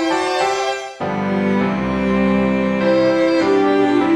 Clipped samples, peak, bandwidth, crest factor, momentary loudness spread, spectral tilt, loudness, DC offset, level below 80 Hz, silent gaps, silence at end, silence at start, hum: under 0.1%; -4 dBFS; 10.5 kHz; 12 dB; 6 LU; -6 dB/octave; -17 LUFS; under 0.1%; -42 dBFS; none; 0 s; 0 s; none